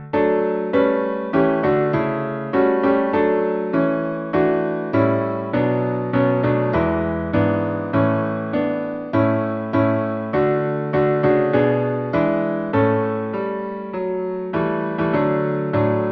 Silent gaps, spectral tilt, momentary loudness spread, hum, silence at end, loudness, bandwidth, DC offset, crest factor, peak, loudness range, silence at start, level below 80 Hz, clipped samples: none; -10.5 dB/octave; 5 LU; none; 0 s; -20 LUFS; 5.8 kHz; under 0.1%; 16 dB; -4 dBFS; 3 LU; 0 s; -48 dBFS; under 0.1%